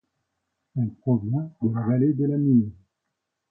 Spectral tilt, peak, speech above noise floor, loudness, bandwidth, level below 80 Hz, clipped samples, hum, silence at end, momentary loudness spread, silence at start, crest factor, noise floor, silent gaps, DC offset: -14.5 dB/octave; -8 dBFS; 58 dB; -24 LUFS; 2.4 kHz; -60 dBFS; under 0.1%; none; 0.8 s; 9 LU; 0.75 s; 16 dB; -81 dBFS; none; under 0.1%